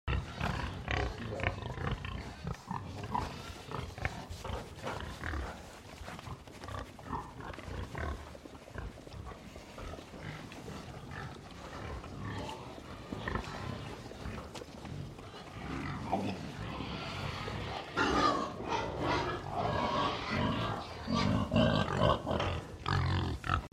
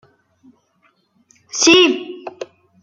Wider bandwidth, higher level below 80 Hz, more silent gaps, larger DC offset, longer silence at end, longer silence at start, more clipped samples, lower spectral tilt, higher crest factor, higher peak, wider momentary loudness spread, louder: first, 15.5 kHz vs 9.4 kHz; first, -48 dBFS vs -62 dBFS; neither; neither; second, 0.05 s vs 0.4 s; second, 0.05 s vs 1.55 s; neither; first, -6 dB/octave vs -1 dB/octave; about the same, 22 dB vs 18 dB; second, -14 dBFS vs -2 dBFS; second, 15 LU vs 25 LU; second, -37 LUFS vs -13 LUFS